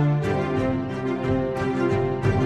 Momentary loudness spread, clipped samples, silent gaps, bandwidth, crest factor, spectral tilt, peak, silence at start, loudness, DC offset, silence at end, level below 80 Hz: 3 LU; under 0.1%; none; 10 kHz; 12 dB; -8.5 dB/octave; -10 dBFS; 0 s; -24 LUFS; under 0.1%; 0 s; -42 dBFS